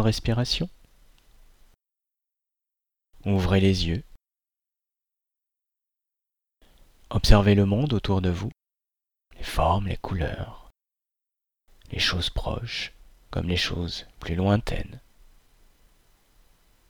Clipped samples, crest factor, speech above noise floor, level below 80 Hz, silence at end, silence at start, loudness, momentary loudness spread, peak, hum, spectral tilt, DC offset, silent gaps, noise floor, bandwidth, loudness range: under 0.1%; 24 dB; over 67 dB; -36 dBFS; 1.9 s; 0 s; -25 LUFS; 15 LU; -2 dBFS; none; -6 dB/octave; under 0.1%; none; under -90 dBFS; 19 kHz; 6 LU